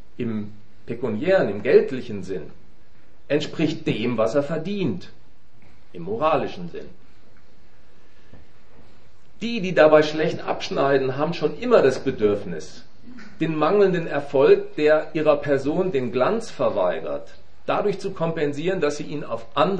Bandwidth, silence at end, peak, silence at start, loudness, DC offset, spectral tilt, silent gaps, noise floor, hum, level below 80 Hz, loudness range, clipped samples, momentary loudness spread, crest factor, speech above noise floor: 9.2 kHz; 0 s; 0 dBFS; 0.2 s; -22 LUFS; 3%; -6.5 dB/octave; none; -56 dBFS; none; -56 dBFS; 10 LU; under 0.1%; 14 LU; 22 dB; 34 dB